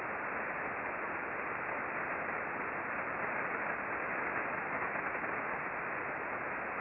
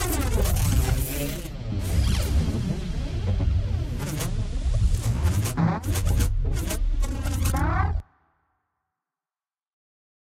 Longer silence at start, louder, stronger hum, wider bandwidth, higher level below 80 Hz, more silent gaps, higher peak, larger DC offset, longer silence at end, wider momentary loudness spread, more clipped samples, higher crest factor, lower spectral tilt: about the same, 0 s vs 0 s; second, -37 LUFS vs -26 LUFS; neither; second, 5.6 kHz vs 16.5 kHz; second, -68 dBFS vs -28 dBFS; neither; second, -22 dBFS vs -10 dBFS; neither; second, 0 s vs 2.3 s; second, 2 LU vs 6 LU; neither; about the same, 16 dB vs 14 dB; about the same, -4.5 dB/octave vs -5.5 dB/octave